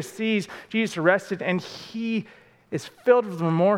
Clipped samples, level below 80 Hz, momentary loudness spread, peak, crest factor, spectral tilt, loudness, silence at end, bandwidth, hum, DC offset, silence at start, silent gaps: under 0.1%; -72 dBFS; 13 LU; -4 dBFS; 20 dB; -6 dB/octave; -25 LUFS; 0 s; 15.5 kHz; none; under 0.1%; 0 s; none